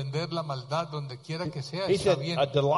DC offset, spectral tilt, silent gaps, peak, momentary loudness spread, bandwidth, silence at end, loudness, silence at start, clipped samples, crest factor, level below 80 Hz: under 0.1%; -6 dB/octave; none; -10 dBFS; 10 LU; 11.5 kHz; 0 s; -29 LUFS; 0 s; under 0.1%; 18 dB; -60 dBFS